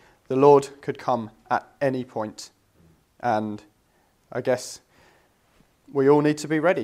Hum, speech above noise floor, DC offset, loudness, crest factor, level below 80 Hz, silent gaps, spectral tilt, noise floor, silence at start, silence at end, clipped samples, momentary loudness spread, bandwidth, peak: none; 42 dB; under 0.1%; -23 LUFS; 22 dB; -68 dBFS; none; -6 dB/octave; -64 dBFS; 0.3 s; 0 s; under 0.1%; 18 LU; 13.5 kHz; -2 dBFS